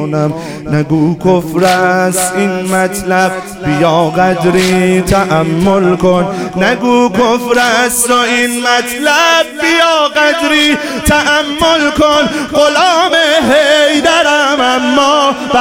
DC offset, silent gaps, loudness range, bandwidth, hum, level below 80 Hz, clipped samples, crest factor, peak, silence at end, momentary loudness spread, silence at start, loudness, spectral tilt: under 0.1%; none; 3 LU; 17.5 kHz; none; -36 dBFS; under 0.1%; 10 dB; 0 dBFS; 0 s; 5 LU; 0 s; -10 LUFS; -4 dB/octave